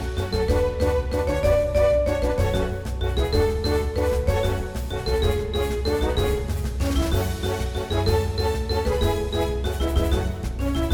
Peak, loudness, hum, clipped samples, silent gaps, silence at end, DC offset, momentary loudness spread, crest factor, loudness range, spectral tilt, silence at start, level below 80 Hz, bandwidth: -8 dBFS; -24 LUFS; none; under 0.1%; none; 0 s; under 0.1%; 6 LU; 14 dB; 2 LU; -6 dB/octave; 0 s; -28 dBFS; 19 kHz